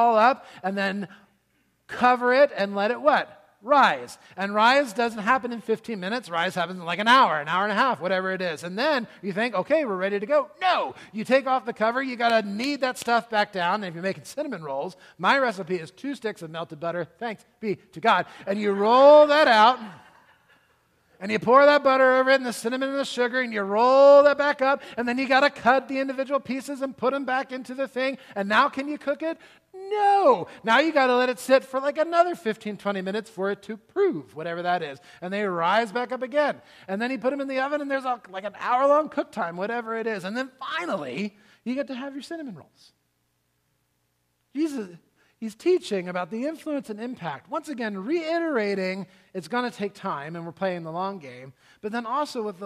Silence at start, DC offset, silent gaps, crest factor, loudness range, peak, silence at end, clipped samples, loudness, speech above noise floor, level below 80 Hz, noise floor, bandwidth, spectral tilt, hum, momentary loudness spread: 0 s; under 0.1%; none; 20 dB; 11 LU; -4 dBFS; 0 s; under 0.1%; -23 LUFS; 49 dB; -74 dBFS; -72 dBFS; 14 kHz; -4.5 dB/octave; none; 15 LU